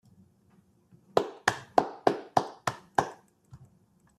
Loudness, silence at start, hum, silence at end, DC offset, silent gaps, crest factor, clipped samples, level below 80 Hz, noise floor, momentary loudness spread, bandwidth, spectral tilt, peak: -30 LUFS; 1.15 s; none; 0.65 s; under 0.1%; none; 26 dB; under 0.1%; -68 dBFS; -65 dBFS; 7 LU; 14.5 kHz; -4 dB/octave; -6 dBFS